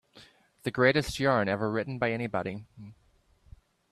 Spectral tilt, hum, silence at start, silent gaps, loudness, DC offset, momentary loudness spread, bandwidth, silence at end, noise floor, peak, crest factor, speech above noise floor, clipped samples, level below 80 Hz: -5.5 dB/octave; none; 0.15 s; none; -28 LUFS; under 0.1%; 14 LU; 14 kHz; 1 s; -63 dBFS; -8 dBFS; 22 dB; 35 dB; under 0.1%; -56 dBFS